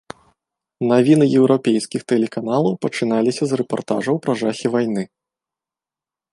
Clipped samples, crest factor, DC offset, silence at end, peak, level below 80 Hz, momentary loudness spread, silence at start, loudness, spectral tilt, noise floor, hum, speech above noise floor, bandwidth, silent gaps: under 0.1%; 18 dB; under 0.1%; 1.25 s; -2 dBFS; -64 dBFS; 9 LU; 0.8 s; -18 LUFS; -6.5 dB/octave; -89 dBFS; none; 72 dB; 11.5 kHz; none